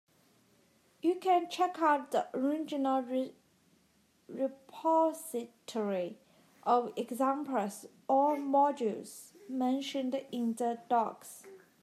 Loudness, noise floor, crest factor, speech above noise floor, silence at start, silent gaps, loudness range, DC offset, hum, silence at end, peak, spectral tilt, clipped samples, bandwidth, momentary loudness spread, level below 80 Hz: -33 LUFS; -70 dBFS; 18 dB; 38 dB; 1.05 s; none; 3 LU; under 0.1%; none; 0.25 s; -14 dBFS; -4.5 dB/octave; under 0.1%; 14.5 kHz; 13 LU; -90 dBFS